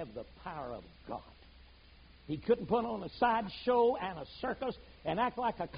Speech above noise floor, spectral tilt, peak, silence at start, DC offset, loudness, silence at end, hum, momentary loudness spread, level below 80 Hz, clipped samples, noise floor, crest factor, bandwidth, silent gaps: 24 dB; -4 dB/octave; -16 dBFS; 0 s; under 0.1%; -34 LUFS; 0 s; none; 16 LU; -58 dBFS; under 0.1%; -58 dBFS; 20 dB; 5 kHz; none